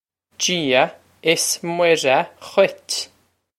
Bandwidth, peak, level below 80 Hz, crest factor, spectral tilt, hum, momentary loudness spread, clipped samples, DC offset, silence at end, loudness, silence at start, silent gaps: 16 kHz; -2 dBFS; -68 dBFS; 20 dB; -2.5 dB/octave; none; 9 LU; under 0.1%; under 0.1%; 0.55 s; -19 LUFS; 0.4 s; none